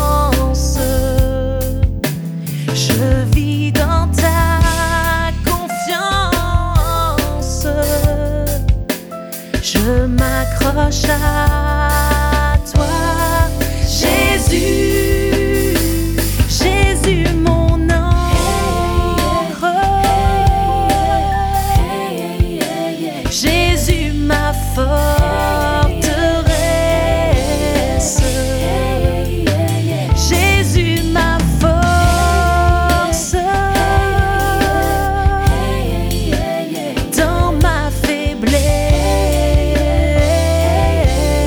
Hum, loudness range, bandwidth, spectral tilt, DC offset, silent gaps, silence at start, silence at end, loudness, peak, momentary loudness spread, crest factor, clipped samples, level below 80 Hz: none; 3 LU; over 20 kHz; -5 dB/octave; under 0.1%; none; 0 s; 0 s; -15 LUFS; -2 dBFS; 5 LU; 12 dB; under 0.1%; -18 dBFS